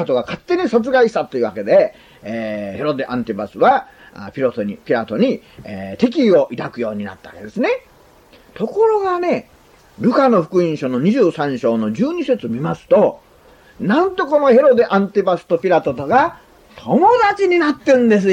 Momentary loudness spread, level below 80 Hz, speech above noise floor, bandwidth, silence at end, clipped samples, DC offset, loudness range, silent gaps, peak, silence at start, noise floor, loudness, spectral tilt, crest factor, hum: 12 LU; -54 dBFS; 31 dB; 9.8 kHz; 0 s; under 0.1%; under 0.1%; 5 LU; none; -2 dBFS; 0 s; -47 dBFS; -16 LUFS; -7 dB/octave; 14 dB; none